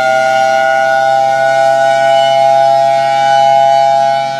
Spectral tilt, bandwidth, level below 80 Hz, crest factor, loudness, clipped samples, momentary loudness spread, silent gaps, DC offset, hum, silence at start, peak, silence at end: -3 dB/octave; 12.5 kHz; -64 dBFS; 10 dB; -9 LUFS; under 0.1%; 2 LU; none; under 0.1%; none; 0 s; 0 dBFS; 0 s